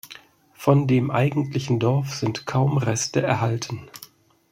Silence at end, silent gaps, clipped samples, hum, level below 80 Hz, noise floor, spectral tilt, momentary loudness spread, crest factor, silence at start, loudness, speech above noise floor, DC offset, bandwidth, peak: 0.45 s; none; under 0.1%; none; -58 dBFS; -49 dBFS; -6 dB/octave; 14 LU; 20 dB; 0.05 s; -22 LUFS; 28 dB; under 0.1%; 16 kHz; -2 dBFS